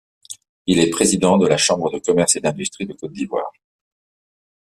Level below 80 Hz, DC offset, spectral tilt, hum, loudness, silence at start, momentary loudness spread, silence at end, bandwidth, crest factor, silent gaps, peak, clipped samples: -54 dBFS; under 0.1%; -4 dB/octave; none; -18 LUFS; 0.3 s; 17 LU; 1.15 s; 14 kHz; 18 dB; 0.49-0.65 s; -2 dBFS; under 0.1%